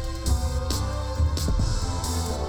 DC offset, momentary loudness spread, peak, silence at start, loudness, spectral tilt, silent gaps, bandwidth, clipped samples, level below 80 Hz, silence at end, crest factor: under 0.1%; 2 LU; -12 dBFS; 0 s; -27 LUFS; -5 dB/octave; none; 18.5 kHz; under 0.1%; -28 dBFS; 0 s; 12 dB